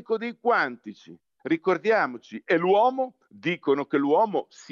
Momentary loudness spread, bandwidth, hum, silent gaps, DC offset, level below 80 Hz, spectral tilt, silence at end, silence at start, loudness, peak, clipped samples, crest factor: 12 LU; 7.4 kHz; none; none; under 0.1%; -86 dBFS; -6.5 dB/octave; 0.1 s; 0.1 s; -25 LUFS; -10 dBFS; under 0.1%; 14 dB